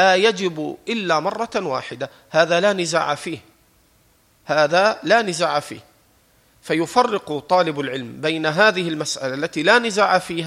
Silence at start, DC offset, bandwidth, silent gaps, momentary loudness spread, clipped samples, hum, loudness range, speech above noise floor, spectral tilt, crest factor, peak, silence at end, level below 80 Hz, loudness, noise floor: 0 s; under 0.1%; 15.5 kHz; none; 11 LU; under 0.1%; none; 3 LU; 38 dB; -3.5 dB/octave; 18 dB; -2 dBFS; 0 s; -64 dBFS; -19 LUFS; -58 dBFS